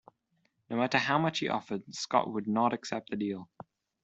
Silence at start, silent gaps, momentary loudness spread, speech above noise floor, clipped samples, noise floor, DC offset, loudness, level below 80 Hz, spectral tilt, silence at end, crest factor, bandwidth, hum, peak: 0.7 s; none; 10 LU; 44 dB; under 0.1%; -75 dBFS; under 0.1%; -31 LUFS; -72 dBFS; -5 dB/octave; 0.6 s; 22 dB; 8.2 kHz; none; -10 dBFS